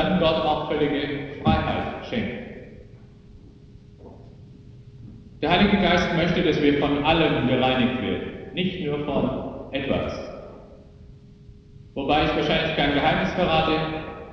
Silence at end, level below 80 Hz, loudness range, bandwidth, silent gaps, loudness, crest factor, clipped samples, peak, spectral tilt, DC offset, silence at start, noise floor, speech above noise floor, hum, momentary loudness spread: 0 s; -42 dBFS; 10 LU; 7 kHz; none; -23 LUFS; 20 dB; under 0.1%; -4 dBFS; -7 dB/octave; under 0.1%; 0 s; -47 dBFS; 25 dB; none; 14 LU